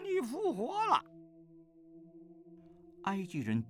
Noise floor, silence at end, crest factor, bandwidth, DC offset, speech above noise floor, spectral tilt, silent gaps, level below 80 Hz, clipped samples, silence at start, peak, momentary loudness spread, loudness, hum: -59 dBFS; 0 s; 20 dB; 15 kHz; under 0.1%; 25 dB; -6 dB/octave; none; -78 dBFS; under 0.1%; 0 s; -16 dBFS; 26 LU; -35 LUFS; none